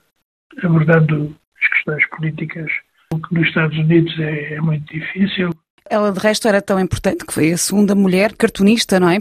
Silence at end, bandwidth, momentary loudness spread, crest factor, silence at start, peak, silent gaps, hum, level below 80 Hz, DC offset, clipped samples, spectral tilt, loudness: 0 s; 14.5 kHz; 10 LU; 16 dB; 0.55 s; 0 dBFS; 1.47-1.52 s, 5.70-5.78 s; none; -46 dBFS; under 0.1%; under 0.1%; -5.5 dB/octave; -16 LUFS